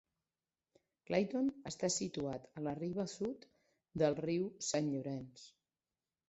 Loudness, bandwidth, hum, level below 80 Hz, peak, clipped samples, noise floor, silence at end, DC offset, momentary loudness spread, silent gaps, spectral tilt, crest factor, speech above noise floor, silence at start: -39 LUFS; 8.2 kHz; none; -72 dBFS; -20 dBFS; under 0.1%; under -90 dBFS; 0.8 s; under 0.1%; 11 LU; none; -5 dB/octave; 20 dB; over 52 dB; 1.1 s